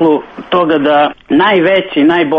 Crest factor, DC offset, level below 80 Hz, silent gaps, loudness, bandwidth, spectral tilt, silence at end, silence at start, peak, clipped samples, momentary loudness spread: 10 dB; under 0.1%; -50 dBFS; none; -11 LUFS; 5.2 kHz; -7.5 dB/octave; 0 s; 0 s; 0 dBFS; under 0.1%; 5 LU